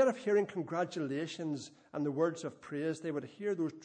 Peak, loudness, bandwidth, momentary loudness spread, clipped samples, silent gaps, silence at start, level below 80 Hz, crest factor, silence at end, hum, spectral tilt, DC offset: -18 dBFS; -36 LUFS; 9.8 kHz; 9 LU; under 0.1%; none; 0 s; -82 dBFS; 16 dB; 0 s; none; -6 dB/octave; under 0.1%